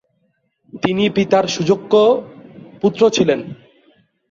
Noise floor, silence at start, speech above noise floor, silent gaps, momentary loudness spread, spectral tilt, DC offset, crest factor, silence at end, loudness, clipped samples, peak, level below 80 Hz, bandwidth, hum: -65 dBFS; 0.75 s; 51 dB; none; 9 LU; -5 dB/octave; under 0.1%; 16 dB; 0.75 s; -16 LUFS; under 0.1%; -2 dBFS; -56 dBFS; 7.6 kHz; none